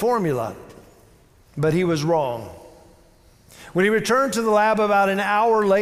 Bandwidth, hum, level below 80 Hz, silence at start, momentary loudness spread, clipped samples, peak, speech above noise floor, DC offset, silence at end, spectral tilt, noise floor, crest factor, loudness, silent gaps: 16 kHz; none; -56 dBFS; 0 s; 14 LU; under 0.1%; -8 dBFS; 34 dB; under 0.1%; 0 s; -5.5 dB/octave; -53 dBFS; 14 dB; -20 LUFS; none